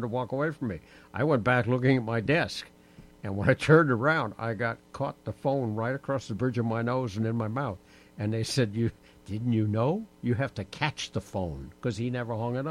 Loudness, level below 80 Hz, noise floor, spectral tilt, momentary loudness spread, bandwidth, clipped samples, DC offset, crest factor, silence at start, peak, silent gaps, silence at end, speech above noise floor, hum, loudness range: -29 LUFS; -56 dBFS; -53 dBFS; -6.5 dB/octave; 11 LU; 13 kHz; under 0.1%; under 0.1%; 22 dB; 0 s; -8 dBFS; none; 0 s; 25 dB; none; 5 LU